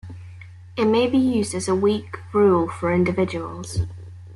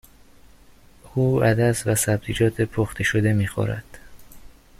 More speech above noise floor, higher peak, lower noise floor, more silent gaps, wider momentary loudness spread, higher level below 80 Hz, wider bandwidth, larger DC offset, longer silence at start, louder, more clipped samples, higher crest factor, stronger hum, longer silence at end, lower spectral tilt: second, 20 dB vs 29 dB; about the same, -8 dBFS vs -6 dBFS; second, -41 dBFS vs -50 dBFS; neither; first, 17 LU vs 8 LU; about the same, -48 dBFS vs -46 dBFS; second, 12 kHz vs 15 kHz; neither; second, 0.05 s vs 1.05 s; about the same, -21 LUFS vs -22 LUFS; neither; about the same, 14 dB vs 16 dB; neither; second, 0 s vs 0.35 s; about the same, -6 dB/octave vs -5.5 dB/octave